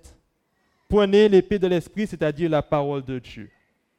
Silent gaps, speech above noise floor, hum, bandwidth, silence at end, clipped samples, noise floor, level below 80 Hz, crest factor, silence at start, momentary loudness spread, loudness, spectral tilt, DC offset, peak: none; 49 dB; none; 11 kHz; 0.55 s; under 0.1%; -69 dBFS; -46 dBFS; 18 dB; 0.9 s; 17 LU; -21 LUFS; -7 dB/octave; under 0.1%; -6 dBFS